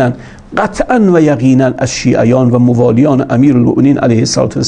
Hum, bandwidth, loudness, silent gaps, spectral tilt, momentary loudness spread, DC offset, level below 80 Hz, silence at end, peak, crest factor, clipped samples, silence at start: none; 10 kHz; -10 LUFS; none; -6.5 dB/octave; 7 LU; under 0.1%; -38 dBFS; 0 s; 0 dBFS; 10 dB; 0.3%; 0 s